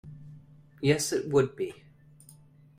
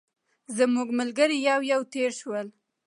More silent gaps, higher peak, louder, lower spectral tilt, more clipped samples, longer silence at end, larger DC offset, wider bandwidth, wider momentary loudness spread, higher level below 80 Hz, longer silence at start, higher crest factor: neither; about the same, -12 dBFS vs -10 dBFS; about the same, -28 LUFS vs -26 LUFS; first, -5 dB/octave vs -3 dB/octave; neither; first, 1.05 s vs 0.35 s; neither; first, 15.5 kHz vs 11.5 kHz; first, 23 LU vs 11 LU; first, -62 dBFS vs -82 dBFS; second, 0.05 s vs 0.5 s; about the same, 20 dB vs 18 dB